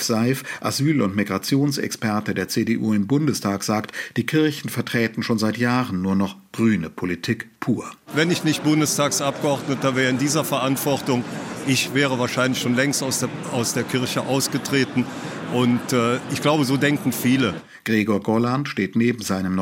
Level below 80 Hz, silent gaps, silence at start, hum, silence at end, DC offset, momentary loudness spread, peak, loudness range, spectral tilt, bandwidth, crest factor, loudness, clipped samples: -62 dBFS; none; 0 s; none; 0 s; under 0.1%; 6 LU; -6 dBFS; 2 LU; -4.5 dB/octave; 17 kHz; 16 dB; -22 LUFS; under 0.1%